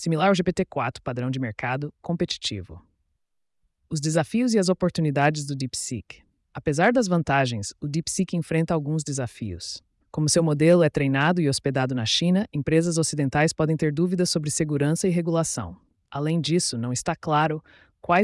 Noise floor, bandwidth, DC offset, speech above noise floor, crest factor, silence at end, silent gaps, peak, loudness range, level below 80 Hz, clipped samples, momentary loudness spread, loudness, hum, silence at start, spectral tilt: -77 dBFS; 12 kHz; under 0.1%; 53 dB; 16 dB; 0 s; none; -8 dBFS; 5 LU; -54 dBFS; under 0.1%; 11 LU; -24 LUFS; none; 0 s; -5 dB/octave